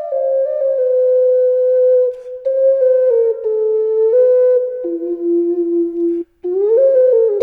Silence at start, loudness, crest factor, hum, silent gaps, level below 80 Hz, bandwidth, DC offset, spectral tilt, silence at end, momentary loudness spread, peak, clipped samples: 0 s; -14 LUFS; 10 dB; none; none; -64 dBFS; 2.1 kHz; under 0.1%; -8 dB/octave; 0 s; 8 LU; -4 dBFS; under 0.1%